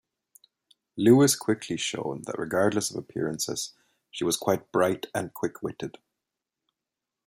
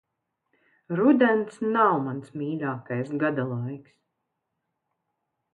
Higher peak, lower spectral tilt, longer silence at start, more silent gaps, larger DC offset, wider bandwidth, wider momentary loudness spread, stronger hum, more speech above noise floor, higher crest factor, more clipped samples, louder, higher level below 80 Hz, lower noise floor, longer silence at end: about the same, -6 dBFS vs -8 dBFS; second, -4.5 dB/octave vs -8.5 dB/octave; about the same, 0.95 s vs 0.9 s; neither; neither; first, 16 kHz vs 9.2 kHz; about the same, 15 LU vs 13 LU; neither; first, 61 dB vs 56 dB; about the same, 22 dB vs 18 dB; neither; about the same, -26 LUFS vs -25 LUFS; first, -68 dBFS vs -76 dBFS; first, -88 dBFS vs -81 dBFS; second, 1.35 s vs 1.75 s